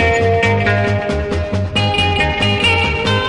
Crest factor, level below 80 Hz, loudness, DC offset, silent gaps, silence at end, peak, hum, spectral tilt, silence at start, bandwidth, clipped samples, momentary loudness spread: 12 dB; -30 dBFS; -15 LUFS; under 0.1%; none; 0 s; -2 dBFS; none; -5.5 dB/octave; 0 s; 11 kHz; under 0.1%; 6 LU